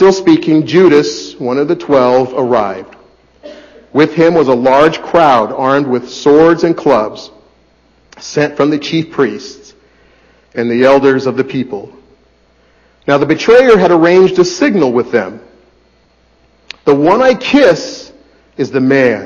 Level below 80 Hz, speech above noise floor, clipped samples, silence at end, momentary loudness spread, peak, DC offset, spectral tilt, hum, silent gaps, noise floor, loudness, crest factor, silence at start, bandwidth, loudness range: -48 dBFS; 41 dB; under 0.1%; 0 s; 13 LU; 0 dBFS; under 0.1%; -6 dB/octave; none; none; -51 dBFS; -10 LUFS; 12 dB; 0 s; 7.4 kHz; 5 LU